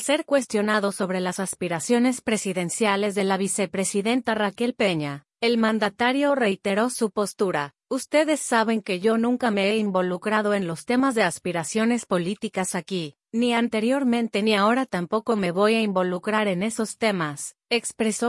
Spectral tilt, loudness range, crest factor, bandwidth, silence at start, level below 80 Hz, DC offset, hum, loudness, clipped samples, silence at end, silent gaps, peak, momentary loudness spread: -4.5 dB/octave; 2 LU; 16 dB; 12 kHz; 0 s; -68 dBFS; under 0.1%; none; -23 LUFS; under 0.1%; 0 s; none; -6 dBFS; 6 LU